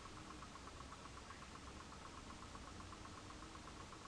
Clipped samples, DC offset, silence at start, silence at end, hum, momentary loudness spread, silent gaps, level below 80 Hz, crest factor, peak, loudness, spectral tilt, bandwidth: under 0.1%; under 0.1%; 0 s; 0 s; none; 1 LU; none; -62 dBFS; 14 dB; -40 dBFS; -55 LUFS; -4 dB/octave; 11 kHz